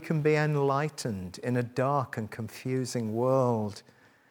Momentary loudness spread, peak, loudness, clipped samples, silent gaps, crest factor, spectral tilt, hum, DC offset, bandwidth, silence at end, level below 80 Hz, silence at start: 11 LU; -12 dBFS; -29 LUFS; under 0.1%; none; 16 dB; -6.5 dB/octave; none; under 0.1%; 18 kHz; 0.5 s; -70 dBFS; 0 s